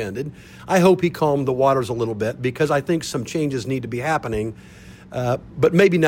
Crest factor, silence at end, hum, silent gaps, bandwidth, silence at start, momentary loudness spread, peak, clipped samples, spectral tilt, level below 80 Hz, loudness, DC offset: 16 dB; 0 s; none; none; 16.5 kHz; 0 s; 14 LU; -4 dBFS; under 0.1%; -6 dB/octave; -48 dBFS; -21 LUFS; under 0.1%